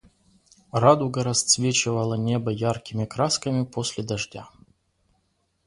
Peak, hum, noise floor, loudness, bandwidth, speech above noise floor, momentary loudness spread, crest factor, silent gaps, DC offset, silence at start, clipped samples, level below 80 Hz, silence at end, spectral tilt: -2 dBFS; none; -71 dBFS; -23 LUFS; 11.5 kHz; 47 dB; 11 LU; 22 dB; none; under 0.1%; 0.75 s; under 0.1%; -58 dBFS; 1.2 s; -4 dB/octave